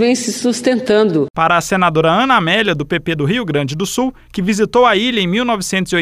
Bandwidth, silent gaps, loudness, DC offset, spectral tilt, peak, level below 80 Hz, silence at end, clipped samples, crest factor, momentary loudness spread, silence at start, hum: 15.5 kHz; 1.30-1.34 s; -14 LUFS; under 0.1%; -4.5 dB/octave; -2 dBFS; -44 dBFS; 0 s; under 0.1%; 14 dB; 7 LU; 0 s; none